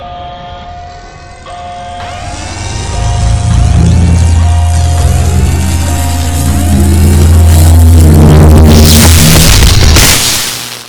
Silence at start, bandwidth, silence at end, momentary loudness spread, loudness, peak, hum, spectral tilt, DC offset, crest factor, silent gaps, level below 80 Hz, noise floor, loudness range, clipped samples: 0 s; over 20 kHz; 0 s; 20 LU; -6 LUFS; 0 dBFS; none; -4.5 dB/octave; under 0.1%; 6 dB; none; -10 dBFS; -28 dBFS; 11 LU; 9%